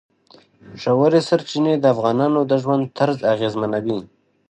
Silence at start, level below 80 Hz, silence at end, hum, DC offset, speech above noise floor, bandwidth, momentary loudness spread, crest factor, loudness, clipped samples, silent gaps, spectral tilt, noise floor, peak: 0.65 s; -64 dBFS; 0.45 s; none; under 0.1%; 34 dB; 9 kHz; 7 LU; 16 dB; -19 LUFS; under 0.1%; none; -7 dB/octave; -52 dBFS; -4 dBFS